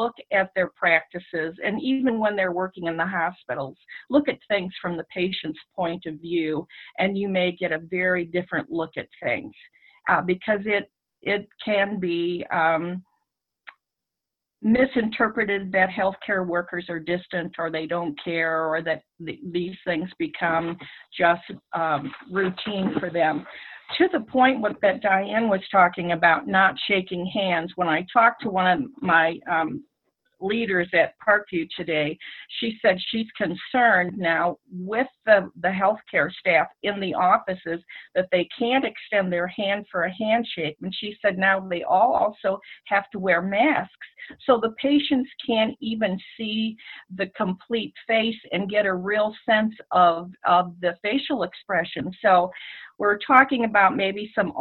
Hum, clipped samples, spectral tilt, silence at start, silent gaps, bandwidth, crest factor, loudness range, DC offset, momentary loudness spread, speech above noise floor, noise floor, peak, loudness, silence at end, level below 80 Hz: none; under 0.1%; -9 dB/octave; 0 s; none; 4.5 kHz; 24 dB; 5 LU; under 0.1%; 11 LU; 63 dB; -87 dBFS; 0 dBFS; -23 LUFS; 0 s; -62 dBFS